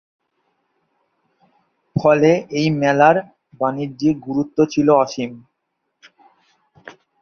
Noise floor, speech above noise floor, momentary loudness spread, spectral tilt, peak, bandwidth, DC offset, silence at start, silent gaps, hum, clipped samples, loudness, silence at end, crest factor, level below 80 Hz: -74 dBFS; 58 dB; 10 LU; -6.5 dB/octave; -2 dBFS; 6.8 kHz; under 0.1%; 1.95 s; none; none; under 0.1%; -17 LUFS; 0.3 s; 18 dB; -58 dBFS